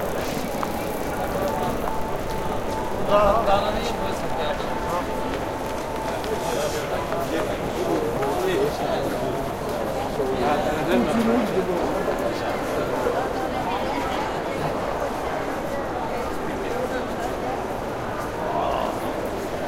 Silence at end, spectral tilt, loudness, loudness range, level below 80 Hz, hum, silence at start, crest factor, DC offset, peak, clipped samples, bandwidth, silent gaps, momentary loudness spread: 0 s; -5 dB/octave; -25 LUFS; 4 LU; -40 dBFS; none; 0 s; 20 dB; under 0.1%; -6 dBFS; under 0.1%; 17 kHz; none; 6 LU